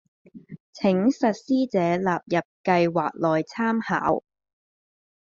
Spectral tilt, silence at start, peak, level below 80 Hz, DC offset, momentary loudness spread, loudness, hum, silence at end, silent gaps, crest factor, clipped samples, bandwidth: -5.5 dB/octave; 0.35 s; -6 dBFS; -64 dBFS; under 0.1%; 5 LU; -24 LUFS; none; 1.15 s; 0.60-0.73 s, 2.45-2.64 s; 20 dB; under 0.1%; 7.4 kHz